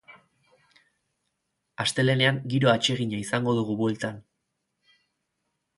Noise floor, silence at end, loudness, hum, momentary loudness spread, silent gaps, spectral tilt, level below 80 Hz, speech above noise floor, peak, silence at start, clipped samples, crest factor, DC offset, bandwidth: -79 dBFS; 1.6 s; -25 LUFS; none; 9 LU; none; -5 dB/octave; -64 dBFS; 55 dB; -6 dBFS; 0.1 s; under 0.1%; 22 dB; under 0.1%; 11.5 kHz